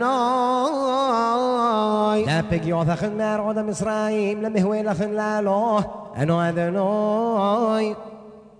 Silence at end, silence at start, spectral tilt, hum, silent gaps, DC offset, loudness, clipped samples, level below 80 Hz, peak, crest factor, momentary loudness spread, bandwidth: 0.1 s; 0 s; -6.5 dB/octave; none; none; under 0.1%; -22 LUFS; under 0.1%; -52 dBFS; -6 dBFS; 14 dB; 4 LU; 10.5 kHz